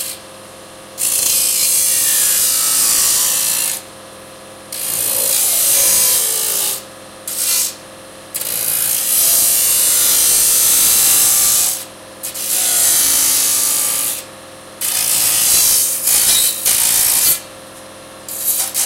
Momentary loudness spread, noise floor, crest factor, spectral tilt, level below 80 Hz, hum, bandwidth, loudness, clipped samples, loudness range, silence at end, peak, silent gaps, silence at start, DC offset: 13 LU; -36 dBFS; 16 dB; 1.5 dB/octave; -50 dBFS; none; 16 kHz; -11 LUFS; under 0.1%; 4 LU; 0 s; 0 dBFS; none; 0 s; under 0.1%